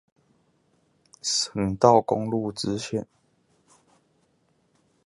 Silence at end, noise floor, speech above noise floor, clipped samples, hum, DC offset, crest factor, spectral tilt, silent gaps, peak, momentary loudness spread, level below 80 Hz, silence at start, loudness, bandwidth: 2.05 s; -68 dBFS; 44 dB; under 0.1%; none; under 0.1%; 26 dB; -4.5 dB/octave; none; -2 dBFS; 14 LU; -56 dBFS; 1.25 s; -24 LUFS; 11.5 kHz